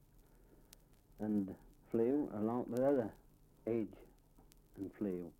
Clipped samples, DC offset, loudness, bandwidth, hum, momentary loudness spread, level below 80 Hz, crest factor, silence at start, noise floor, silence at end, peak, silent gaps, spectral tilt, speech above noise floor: under 0.1%; under 0.1%; -39 LUFS; 16.5 kHz; none; 14 LU; -68 dBFS; 18 dB; 1.2 s; -65 dBFS; 0.1 s; -22 dBFS; none; -9 dB/octave; 28 dB